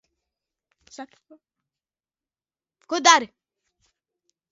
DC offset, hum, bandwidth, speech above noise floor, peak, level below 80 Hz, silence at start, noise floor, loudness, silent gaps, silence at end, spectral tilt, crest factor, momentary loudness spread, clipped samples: under 0.1%; none; 11 kHz; over 68 dB; 0 dBFS; -78 dBFS; 1 s; under -90 dBFS; -18 LUFS; none; 1.25 s; 0.5 dB/octave; 28 dB; 26 LU; under 0.1%